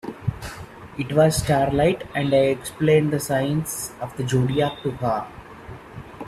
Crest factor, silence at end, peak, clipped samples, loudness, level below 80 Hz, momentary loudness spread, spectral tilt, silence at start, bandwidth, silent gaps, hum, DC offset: 18 dB; 0 s; -4 dBFS; under 0.1%; -22 LUFS; -46 dBFS; 20 LU; -5.5 dB/octave; 0.05 s; 14.5 kHz; none; none; under 0.1%